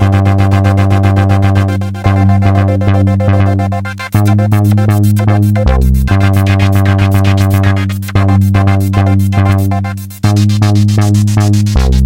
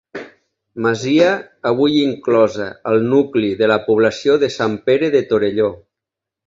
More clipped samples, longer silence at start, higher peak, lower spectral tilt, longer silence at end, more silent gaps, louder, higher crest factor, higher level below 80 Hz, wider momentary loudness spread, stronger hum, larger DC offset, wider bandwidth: first, 0.3% vs under 0.1%; second, 0 s vs 0.15 s; about the same, 0 dBFS vs 0 dBFS; first, -7.5 dB/octave vs -6 dB/octave; second, 0 s vs 0.75 s; neither; first, -10 LUFS vs -16 LUFS; second, 8 dB vs 16 dB; first, -20 dBFS vs -54 dBFS; second, 4 LU vs 7 LU; neither; first, 0.2% vs under 0.1%; first, 16 kHz vs 7.6 kHz